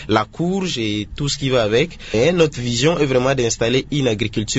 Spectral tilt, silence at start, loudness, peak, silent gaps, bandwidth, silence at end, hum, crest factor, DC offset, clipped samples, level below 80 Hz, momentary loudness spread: -4.5 dB/octave; 0 s; -18 LUFS; 0 dBFS; none; 8 kHz; 0 s; none; 18 dB; under 0.1%; under 0.1%; -40 dBFS; 6 LU